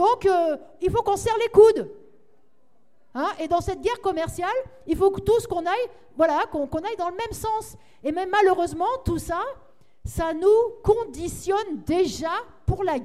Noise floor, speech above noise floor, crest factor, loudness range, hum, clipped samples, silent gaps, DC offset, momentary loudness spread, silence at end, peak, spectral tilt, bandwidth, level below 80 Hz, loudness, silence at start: -67 dBFS; 44 dB; 20 dB; 3 LU; none; under 0.1%; none; 0.3%; 10 LU; 0 s; -4 dBFS; -5.5 dB/octave; 15 kHz; -44 dBFS; -23 LUFS; 0 s